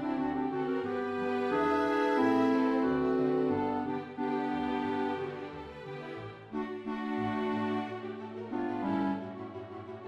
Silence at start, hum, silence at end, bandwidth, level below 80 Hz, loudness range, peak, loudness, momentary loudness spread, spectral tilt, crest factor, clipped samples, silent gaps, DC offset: 0 s; none; 0 s; 9 kHz; -64 dBFS; 7 LU; -16 dBFS; -32 LUFS; 14 LU; -7.5 dB/octave; 16 dB; under 0.1%; none; under 0.1%